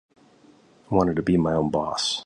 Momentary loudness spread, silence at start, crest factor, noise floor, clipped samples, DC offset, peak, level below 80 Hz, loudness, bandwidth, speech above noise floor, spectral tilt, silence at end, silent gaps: 3 LU; 0.9 s; 18 dB; -55 dBFS; under 0.1%; under 0.1%; -6 dBFS; -48 dBFS; -23 LUFS; 11 kHz; 32 dB; -5.5 dB/octave; 0 s; none